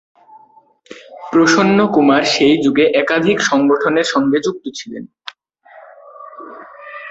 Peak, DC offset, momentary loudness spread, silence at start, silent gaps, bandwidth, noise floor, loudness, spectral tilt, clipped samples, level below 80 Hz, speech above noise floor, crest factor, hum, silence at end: -2 dBFS; under 0.1%; 22 LU; 0.9 s; none; 8.2 kHz; -49 dBFS; -13 LUFS; -4.5 dB/octave; under 0.1%; -56 dBFS; 36 dB; 14 dB; none; 0 s